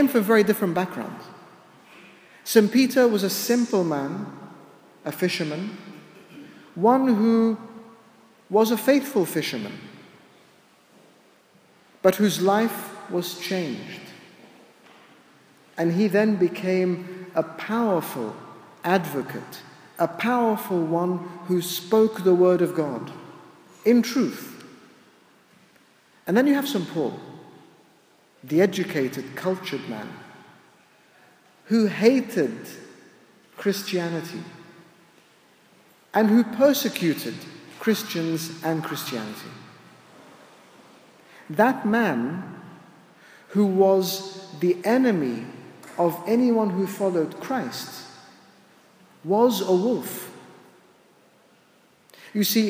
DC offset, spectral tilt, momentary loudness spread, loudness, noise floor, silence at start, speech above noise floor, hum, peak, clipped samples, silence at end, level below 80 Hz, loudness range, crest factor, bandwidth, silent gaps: under 0.1%; -5.5 dB/octave; 21 LU; -23 LUFS; -58 dBFS; 0 s; 36 dB; none; -4 dBFS; under 0.1%; 0 s; -78 dBFS; 6 LU; 22 dB; 16 kHz; none